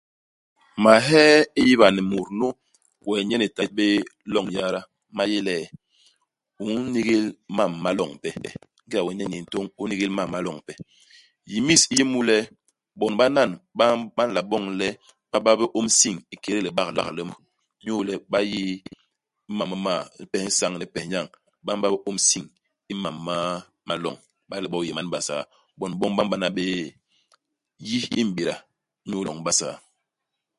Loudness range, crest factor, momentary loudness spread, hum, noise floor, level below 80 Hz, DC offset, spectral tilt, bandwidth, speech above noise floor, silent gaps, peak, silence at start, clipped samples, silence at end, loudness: 8 LU; 24 dB; 17 LU; none; -82 dBFS; -62 dBFS; under 0.1%; -3 dB/octave; 11.5 kHz; 60 dB; none; 0 dBFS; 0.75 s; under 0.1%; 0.8 s; -23 LUFS